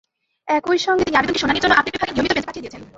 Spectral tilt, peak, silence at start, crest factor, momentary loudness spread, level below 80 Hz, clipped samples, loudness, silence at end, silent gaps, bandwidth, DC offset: -3.5 dB/octave; -2 dBFS; 0.45 s; 18 dB; 12 LU; -46 dBFS; under 0.1%; -18 LUFS; 0.1 s; none; 8 kHz; under 0.1%